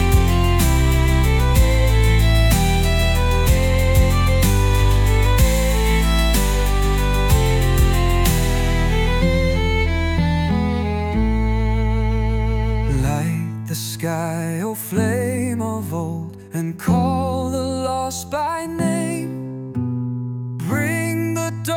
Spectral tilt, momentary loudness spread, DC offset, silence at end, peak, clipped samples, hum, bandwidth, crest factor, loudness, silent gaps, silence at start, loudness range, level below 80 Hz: -5.5 dB/octave; 8 LU; under 0.1%; 0 s; -4 dBFS; under 0.1%; none; 18.5 kHz; 14 dB; -19 LUFS; none; 0 s; 6 LU; -20 dBFS